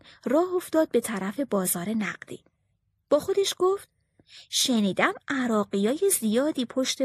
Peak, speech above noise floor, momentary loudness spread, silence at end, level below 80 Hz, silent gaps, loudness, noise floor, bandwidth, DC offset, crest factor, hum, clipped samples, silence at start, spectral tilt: -6 dBFS; 48 dB; 7 LU; 0 s; -68 dBFS; none; -25 LUFS; -73 dBFS; 13 kHz; under 0.1%; 20 dB; none; under 0.1%; 0.25 s; -3.5 dB/octave